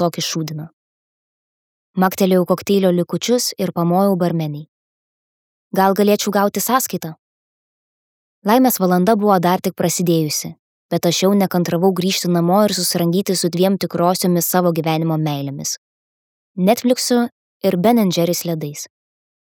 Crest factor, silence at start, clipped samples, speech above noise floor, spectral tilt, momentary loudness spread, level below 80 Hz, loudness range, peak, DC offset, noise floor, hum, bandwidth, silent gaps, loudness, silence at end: 16 dB; 0 s; under 0.1%; over 74 dB; -5 dB/octave; 10 LU; -66 dBFS; 3 LU; 0 dBFS; under 0.1%; under -90 dBFS; none; 19 kHz; 0.73-1.94 s, 4.68-5.71 s, 7.19-8.42 s, 10.59-10.89 s, 15.78-16.55 s, 17.32-17.60 s; -17 LUFS; 0.6 s